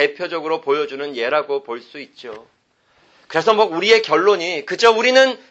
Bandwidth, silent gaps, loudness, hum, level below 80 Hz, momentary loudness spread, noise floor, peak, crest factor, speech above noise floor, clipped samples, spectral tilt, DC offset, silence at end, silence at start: 8.2 kHz; none; -17 LUFS; none; -68 dBFS; 20 LU; -60 dBFS; 0 dBFS; 18 dB; 42 dB; under 0.1%; -3 dB/octave; under 0.1%; 0.15 s; 0 s